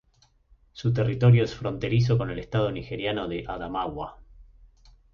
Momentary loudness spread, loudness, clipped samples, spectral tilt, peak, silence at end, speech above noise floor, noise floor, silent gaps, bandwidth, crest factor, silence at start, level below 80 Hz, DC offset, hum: 13 LU; -26 LUFS; under 0.1%; -8 dB/octave; -8 dBFS; 0.7 s; 38 dB; -63 dBFS; none; 7 kHz; 18 dB; 0.75 s; -48 dBFS; under 0.1%; none